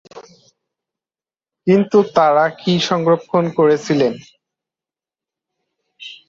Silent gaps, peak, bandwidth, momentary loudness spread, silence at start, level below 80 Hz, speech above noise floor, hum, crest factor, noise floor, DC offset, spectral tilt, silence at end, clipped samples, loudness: none; -2 dBFS; 7.8 kHz; 11 LU; 0.15 s; -62 dBFS; over 75 dB; none; 16 dB; under -90 dBFS; under 0.1%; -6 dB/octave; 0.15 s; under 0.1%; -16 LUFS